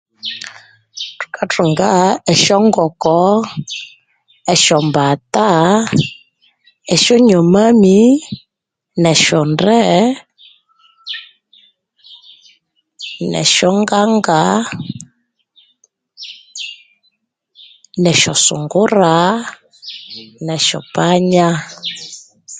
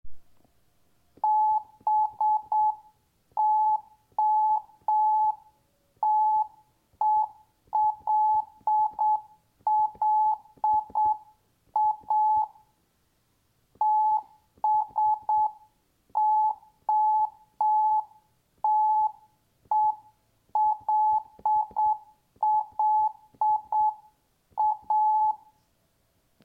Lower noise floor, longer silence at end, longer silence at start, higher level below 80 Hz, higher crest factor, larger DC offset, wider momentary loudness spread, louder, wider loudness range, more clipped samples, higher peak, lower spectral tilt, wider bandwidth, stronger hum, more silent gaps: first, -78 dBFS vs -70 dBFS; second, 0 s vs 1.1 s; first, 0.25 s vs 0.05 s; first, -54 dBFS vs -66 dBFS; about the same, 14 dB vs 10 dB; neither; first, 20 LU vs 8 LU; first, -12 LUFS vs -26 LUFS; first, 8 LU vs 2 LU; neither; first, 0 dBFS vs -16 dBFS; second, -4 dB/octave vs -5.5 dB/octave; first, 9.6 kHz vs 1.7 kHz; neither; neither